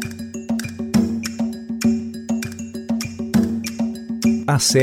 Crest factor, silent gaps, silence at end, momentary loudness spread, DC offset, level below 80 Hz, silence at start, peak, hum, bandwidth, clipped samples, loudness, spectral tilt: 16 dB; none; 0 s; 7 LU; under 0.1%; -48 dBFS; 0 s; -6 dBFS; none; 16.5 kHz; under 0.1%; -22 LUFS; -4.5 dB/octave